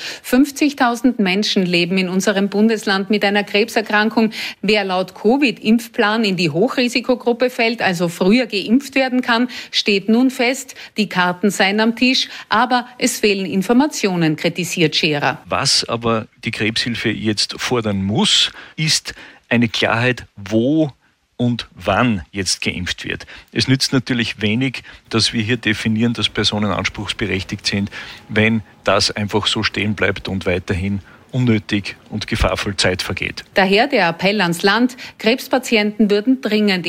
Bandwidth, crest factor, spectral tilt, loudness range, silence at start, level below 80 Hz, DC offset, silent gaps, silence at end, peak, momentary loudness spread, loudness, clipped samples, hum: 16 kHz; 14 dB; -4.5 dB/octave; 3 LU; 0 s; -42 dBFS; under 0.1%; none; 0 s; -4 dBFS; 7 LU; -17 LUFS; under 0.1%; none